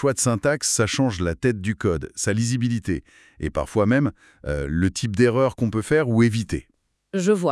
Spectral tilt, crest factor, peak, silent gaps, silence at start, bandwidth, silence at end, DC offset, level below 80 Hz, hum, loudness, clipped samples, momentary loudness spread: -5 dB/octave; 18 dB; -4 dBFS; none; 0 s; 12 kHz; 0 s; under 0.1%; -44 dBFS; none; -22 LUFS; under 0.1%; 10 LU